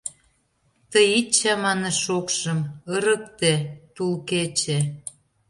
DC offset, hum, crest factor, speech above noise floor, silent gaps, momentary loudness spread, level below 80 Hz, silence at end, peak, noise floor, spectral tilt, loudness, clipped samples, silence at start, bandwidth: under 0.1%; none; 20 dB; 44 dB; none; 11 LU; -64 dBFS; 0.4 s; -4 dBFS; -66 dBFS; -3.5 dB/octave; -22 LUFS; under 0.1%; 0.05 s; 11.5 kHz